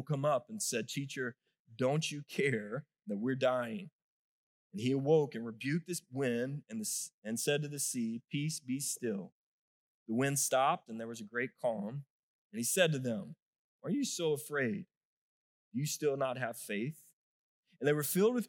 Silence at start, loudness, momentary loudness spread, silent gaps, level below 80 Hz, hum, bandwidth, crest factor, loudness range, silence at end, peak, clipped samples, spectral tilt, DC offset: 0 s; -35 LUFS; 13 LU; 1.59-1.65 s, 3.92-4.70 s, 7.14-7.22 s, 9.32-10.06 s, 12.10-12.50 s, 13.42-13.79 s, 14.97-15.71 s, 17.13-17.63 s; under -90 dBFS; none; 18 kHz; 22 dB; 3 LU; 0 s; -14 dBFS; under 0.1%; -4.5 dB/octave; under 0.1%